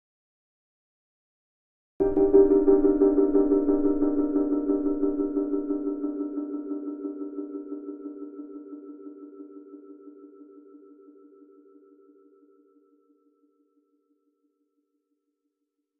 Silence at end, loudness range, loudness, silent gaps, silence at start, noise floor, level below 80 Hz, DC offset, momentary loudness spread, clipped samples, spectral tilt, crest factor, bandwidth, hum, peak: 5.25 s; 22 LU; -24 LUFS; none; 2 s; -82 dBFS; -48 dBFS; under 0.1%; 24 LU; under 0.1%; -12 dB/octave; 22 dB; 1.9 kHz; none; -6 dBFS